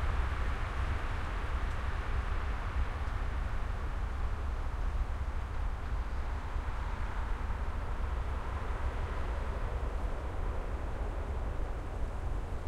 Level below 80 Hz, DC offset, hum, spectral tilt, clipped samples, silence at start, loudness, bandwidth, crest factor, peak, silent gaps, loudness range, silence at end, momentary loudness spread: -36 dBFS; under 0.1%; none; -6.5 dB/octave; under 0.1%; 0 s; -38 LUFS; 10.5 kHz; 14 dB; -20 dBFS; none; 2 LU; 0 s; 3 LU